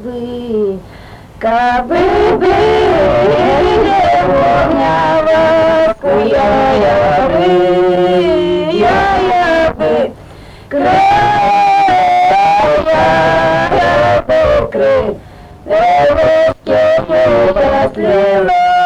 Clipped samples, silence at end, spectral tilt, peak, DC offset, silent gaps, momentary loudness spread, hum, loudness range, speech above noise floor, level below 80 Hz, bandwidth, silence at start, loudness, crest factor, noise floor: under 0.1%; 0 s; -6 dB/octave; -2 dBFS; under 0.1%; none; 5 LU; none; 2 LU; 23 dB; -32 dBFS; 10.5 kHz; 0 s; -10 LUFS; 8 dB; -33 dBFS